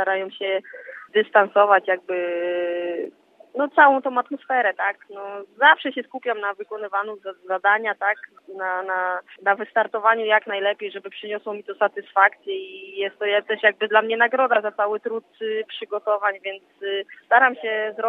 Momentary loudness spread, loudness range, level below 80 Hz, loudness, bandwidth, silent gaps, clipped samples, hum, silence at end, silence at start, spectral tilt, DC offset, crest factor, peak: 15 LU; 4 LU; under -90 dBFS; -21 LUFS; 4.1 kHz; none; under 0.1%; none; 0 s; 0 s; -5.5 dB/octave; under 0.1%; 22 dB; 0 dBFS